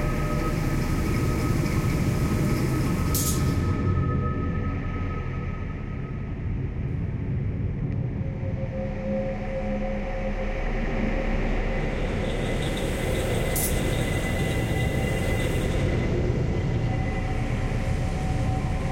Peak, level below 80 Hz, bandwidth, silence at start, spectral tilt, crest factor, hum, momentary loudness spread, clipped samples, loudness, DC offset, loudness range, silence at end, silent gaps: -12 dBFS; -32 dBFS; 16.5 kHz; 0 s; -6 dB/octave; 14 dB; none; 6 LU; under 0.1%; -27 LUFS; under 0.1%; 5 LU; 0 s; none